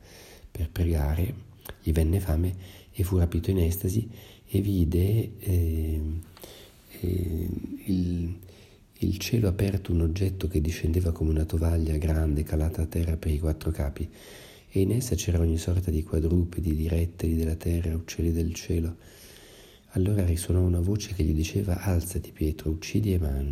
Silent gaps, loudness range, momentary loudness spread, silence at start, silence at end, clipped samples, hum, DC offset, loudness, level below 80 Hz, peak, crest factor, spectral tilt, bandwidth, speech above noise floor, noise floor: none; 3 LU; 13 LU; 0.05 s; 0 s; under 0.1%; none; under 0.1%; -28 LUFS; -34 dBFS; -12 dBFS; 14 dB; -7 dB/octave; 16 kHz; 27 dB; -53 dBFS